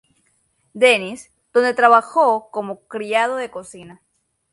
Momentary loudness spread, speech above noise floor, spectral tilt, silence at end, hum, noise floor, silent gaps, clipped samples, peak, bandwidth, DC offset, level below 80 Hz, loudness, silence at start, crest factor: 18 LU; 46 dB; -3 dB/octave; 0.65 s; none; -64 dBFS; none; under 0.1%; 0 dBFS; 11.5 kHz; under 0.1%; -68 dBFS; -17 LUFS; 0.75 s; 20 dB